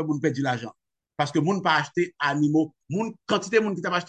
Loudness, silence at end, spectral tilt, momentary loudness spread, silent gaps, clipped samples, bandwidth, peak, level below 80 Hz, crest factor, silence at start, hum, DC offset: -25 LUFS; 0 s; -5.5 dB/octave; 8 LU; none; under 0.1%; 9 kHz; -6 dBFS; -70 dBFS; 18 dB; 0 s; none; under 0.1%